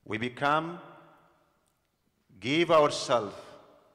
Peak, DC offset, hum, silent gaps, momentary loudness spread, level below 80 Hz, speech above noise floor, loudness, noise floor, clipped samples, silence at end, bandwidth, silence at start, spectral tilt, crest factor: -12 dBFS; under 0.1%; none; none; 17 LU; -70 dBFS; 47 dB; -27 LUFS; -74 dBFS; under 0.1%; 0.4 s; 12 kHz; 0.1 s; -4.5 dB/octave; 18 dB